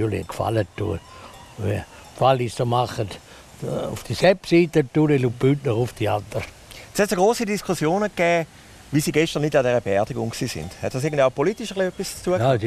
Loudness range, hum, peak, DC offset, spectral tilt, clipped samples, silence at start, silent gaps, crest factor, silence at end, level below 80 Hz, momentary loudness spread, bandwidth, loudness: 4 LU; none; -4 dBFS; under 0.1%; -6 dB/octave; under 0.1%; 0 s; none; 18 dB; 0 s; -48 dBFS; 12 LU; 15 kHz; -22 LUFS